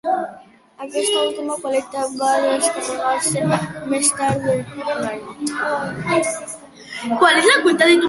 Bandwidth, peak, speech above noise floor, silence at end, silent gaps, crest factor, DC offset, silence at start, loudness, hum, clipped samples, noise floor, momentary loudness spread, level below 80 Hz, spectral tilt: 12 kHz; -2 dBFS; 25 dB; 0 s; none; 18 dB; under 0.1%; 0.05 s; -19 LUFS; none; under 0.1%; -44 dBFS; 14 LU; -58 dBFS; -3 dB/octave